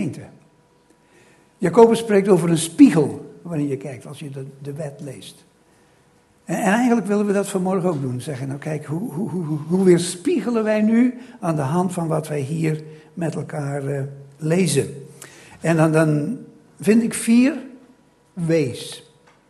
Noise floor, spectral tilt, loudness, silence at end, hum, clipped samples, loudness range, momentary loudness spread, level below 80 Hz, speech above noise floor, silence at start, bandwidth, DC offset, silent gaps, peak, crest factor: -56 dBFS; -6.5 dB/octave; -20 LUFS; 0.5 s; none; under 0.1%; 7 LU; 18 LU; -62 dBFS; 37 dB; 0 s; 12.5 kHz; under 0.1%; none; 0 dBFS; 20 dB